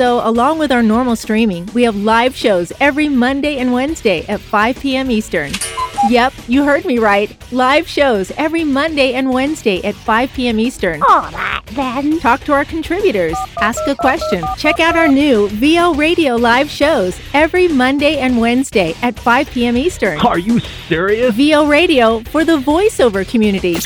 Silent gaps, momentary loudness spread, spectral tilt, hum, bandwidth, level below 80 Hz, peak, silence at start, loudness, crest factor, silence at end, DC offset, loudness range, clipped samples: none; 6 LU; -4.5 dB/octave; none; over 20 kHz; -36 dBFS; -2 dBFS; 0 s; -13 LUFS; 12 dB; 0 s; under 0.1%; 3 LU; under 0.1%